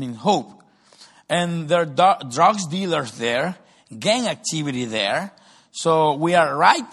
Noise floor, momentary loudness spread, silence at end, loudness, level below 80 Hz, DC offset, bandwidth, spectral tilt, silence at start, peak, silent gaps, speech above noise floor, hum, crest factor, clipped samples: -51 dBFS; 9 LU; 0 s; -20 LUFS; -66 dBFS; under 0.1%; 12.5 kHz; -4 dB/octave; 0 s; 0 dBFS; none; 31 dB; none; 20 dB; under 0.1%